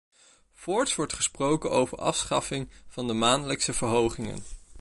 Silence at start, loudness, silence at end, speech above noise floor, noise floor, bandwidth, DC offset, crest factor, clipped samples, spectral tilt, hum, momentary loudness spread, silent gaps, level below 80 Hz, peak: 0.6 s; -27 LUFS; 0 s; 30 dB; -58 dBFS; 11.5 kHz; under 0.1%; 20 dB; under 0.1%; -3.5 dB/octave; none; 13 LU; none; -50 dBFS; -8 dBFS